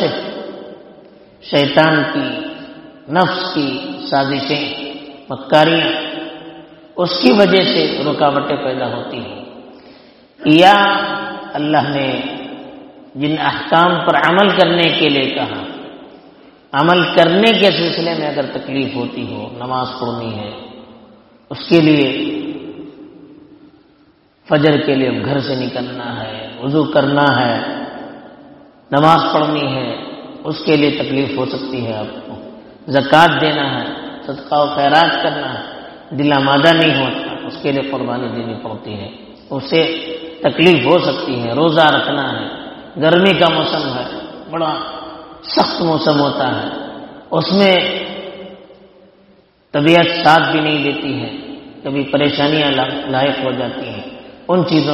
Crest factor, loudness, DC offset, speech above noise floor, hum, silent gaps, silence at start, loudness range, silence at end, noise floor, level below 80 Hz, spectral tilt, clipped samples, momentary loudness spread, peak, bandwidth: 16 dB; -15 LUFS; under 0.1%; 37 dB; none; none; 0 s; 4 LU; 0 s; -52 dBFS; -54 dBFS; -6.5 dB/octave; 0.1%; 19 LU; 0 dBFS; 10.5 kHz